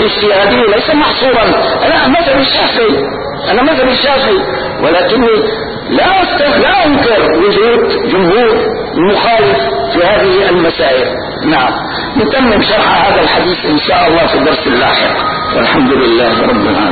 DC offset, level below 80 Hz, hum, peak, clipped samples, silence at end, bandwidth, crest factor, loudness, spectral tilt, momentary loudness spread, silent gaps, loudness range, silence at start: 0.5%; -34 dBFS; none; 0 dBFS; under 0.1%; 0 s; 4.8 kHz; 10 dB; -9 LUFS; -10 dB/octave; 5 LU; none; 1 LU; 0 s